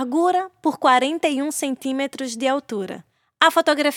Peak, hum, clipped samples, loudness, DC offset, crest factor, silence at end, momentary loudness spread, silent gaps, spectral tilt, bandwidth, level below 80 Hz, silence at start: 0 dBFS; none; under 0.1%; -20 LUFS; under 0.1%; 20 dB; 0 s; 11 LU; none; -2.5 dB/octave; 19 kHz; -76 dBFS; 0 s